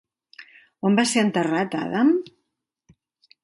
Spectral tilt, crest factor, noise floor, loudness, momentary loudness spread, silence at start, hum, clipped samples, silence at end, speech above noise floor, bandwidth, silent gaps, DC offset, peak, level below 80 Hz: -4.5 dB/octave; 18 dB; -78 dBFS; -22 LUFS; 7 LU; 0.4 s; none; under 0.1%; 1.2 s; 57 dB; 11.5 kHz; none; under 0.1%; -6 dBFS; -70 dBFS